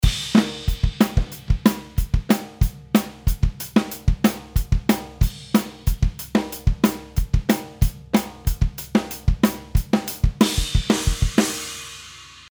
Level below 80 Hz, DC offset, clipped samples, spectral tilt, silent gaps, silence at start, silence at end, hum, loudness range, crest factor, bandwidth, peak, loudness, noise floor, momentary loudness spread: -26 dBFS; under 0.1%; under 0.1%; -5.5 dB/octave; none; 0 s; 0.25 s; none; 2 LU; 20 dB; over 20 kHz; -2 dBFS; -22 LUFS; -42 dBFS; 7 LU